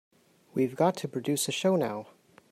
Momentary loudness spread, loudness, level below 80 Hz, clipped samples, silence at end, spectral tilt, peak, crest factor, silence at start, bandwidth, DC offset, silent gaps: 8 LU; -29 LUFS; -74 dBFS; under 0.1%; 0.5 s; -4.5 dB/octave; -12 dBFS; 18 dB; 0.55 s; 16 kHz; under 0.1%; none